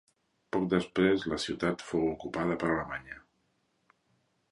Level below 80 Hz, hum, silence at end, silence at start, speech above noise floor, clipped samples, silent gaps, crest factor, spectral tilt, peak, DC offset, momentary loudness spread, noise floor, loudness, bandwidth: -58 dBFS; none; 1.3 s; 0.55 s; 44 dB; under 0.1%; none; 22 dB; -6 dB/octave; -12 dBFS; under 0.1%; 12 LU; -75 dBFS; -31 LUFS; 11.5 kHz